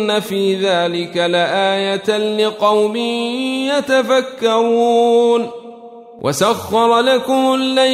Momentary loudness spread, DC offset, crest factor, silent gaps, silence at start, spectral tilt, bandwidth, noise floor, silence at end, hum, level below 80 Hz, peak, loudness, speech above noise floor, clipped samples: 6 LU; under 0.1%; 14 dB; none; 0 s; -4 dB/octave; 15.5 kHz; -36 dBFS; 0 s; none; -60 dBFS; -2 dBFS; -15 LUFS; 22 dB; under 0.1%